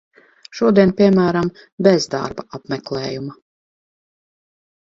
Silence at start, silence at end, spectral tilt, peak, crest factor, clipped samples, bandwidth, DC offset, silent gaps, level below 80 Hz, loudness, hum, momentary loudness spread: 0.55 s; 1.55 s; -6.5 dB/octave; 0 dBFS; 18 dB; under 0.1%; 7.8 kHz; under 0.1%; 1.72-1.78 s; -54 dBFS; -17 LUFS; none; 16 LU